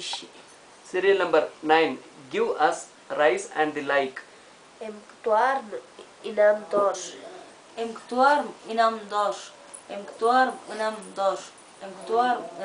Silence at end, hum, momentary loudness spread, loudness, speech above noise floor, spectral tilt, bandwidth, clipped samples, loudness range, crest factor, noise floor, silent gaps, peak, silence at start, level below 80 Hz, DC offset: 0 s; none; 19 LU; -25 LUFS; 26 dB; -3 dB/octave; 10.5 kHz; under 0.1%; 3 LU; 22 dB; -51 dBFS; none; -4 dBFS; 0 s; -74 dBFS; under 0.1%